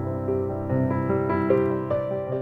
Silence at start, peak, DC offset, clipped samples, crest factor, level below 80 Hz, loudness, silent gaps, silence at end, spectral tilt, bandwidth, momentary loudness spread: 0 s; -8 dBFS; under 0.1%; under 0.1%; 16 dB; -52 dBFS; -25 LUFS; none; 0 s; -11 dB/octave; 4.6 kHz; 5 LU